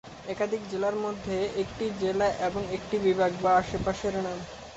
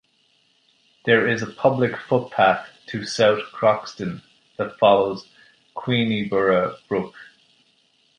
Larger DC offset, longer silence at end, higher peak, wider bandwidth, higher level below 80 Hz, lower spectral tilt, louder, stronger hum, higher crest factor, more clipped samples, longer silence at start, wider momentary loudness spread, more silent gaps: neither; second, 0 s vs 0.95 s; second, -12 dBFS vs -2 dBFS; second, 8.2 kHz vs 10 kHz; first, -50 dBFS vs -60 dBFS; about the same, -5.5 dB/octave vs -5.5 dB/octave; second, -29 LUFS vs -21 LUFS; neither; about the same, 18 dB vs 20 dB; neither; second, 0.05 s vs 1.05 s; second, 8 LU vs 14 LU; neither